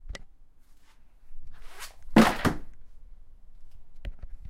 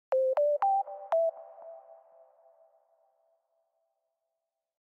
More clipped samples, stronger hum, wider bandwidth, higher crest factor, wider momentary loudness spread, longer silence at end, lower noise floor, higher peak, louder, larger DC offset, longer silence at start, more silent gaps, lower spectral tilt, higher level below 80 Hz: neither; neither; first, 16 kHz vs 5.8 kHz; first, 26 dB vs 14 dB; first, 25 LU vs 22 LU; second, 0 s vs 3.05 s; second, -51 dBFS vs -87 dBFS; first, -4 dBFS vs -20 dBFS; first, -24 LUFS vs -29 LUFS; neither; about the same, 0 s vs 0.1 s; neither; first, -5.5 dB/octave vs -2.5 dB/octave; first, -42 dBFS vs under -90 dBFS